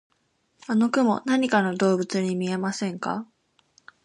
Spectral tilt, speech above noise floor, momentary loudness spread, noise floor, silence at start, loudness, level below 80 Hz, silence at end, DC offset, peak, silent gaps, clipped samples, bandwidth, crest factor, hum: -5.5 dB/octave; 46 dB; 9 LU; -69 dBFS; 0.7 s; -24 LUFS; -72 dBFS; 0.8 s; under 0.1%; -6 dBFS; none; under 0.1%; 11 kHz; 18 dB; none